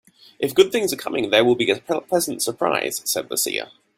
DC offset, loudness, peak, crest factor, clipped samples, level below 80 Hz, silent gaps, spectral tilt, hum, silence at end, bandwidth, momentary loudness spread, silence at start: under 0.1%; -21 LUFS; -2 dBFS; 20 dB; under 0.1%; -62 dBFS; none; -2.5 dB/octave; none; 0.3 s; 16.5 kHz; 7 LU; 0.4 s